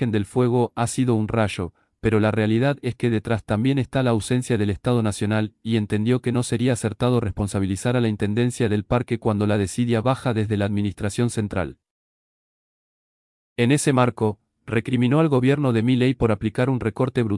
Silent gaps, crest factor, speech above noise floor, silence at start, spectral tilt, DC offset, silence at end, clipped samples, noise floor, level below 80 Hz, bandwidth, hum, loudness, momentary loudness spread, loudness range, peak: 11.91-13.56 s; 16 dB; over 69 dB; 0 s; -6.5 dB/octave; under 0.1%; 0 s; under 0.1%; under -90 dBFS; -48 dBFS; 12 kHz; none; -22 LUFS; 6 LU; 4 LU; -6 dBFS